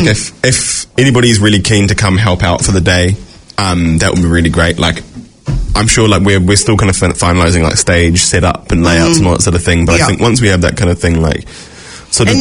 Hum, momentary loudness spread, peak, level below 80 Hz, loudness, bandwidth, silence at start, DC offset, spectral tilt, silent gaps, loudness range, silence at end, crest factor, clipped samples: none; 7 LU; 0 dBFS; -26 dBFS; -10 LUFS; 11 kHz; 0 s; under 0.1%; -4.5 dB/octave; none; 2 LU; 0 s; 10 dB; 0.4%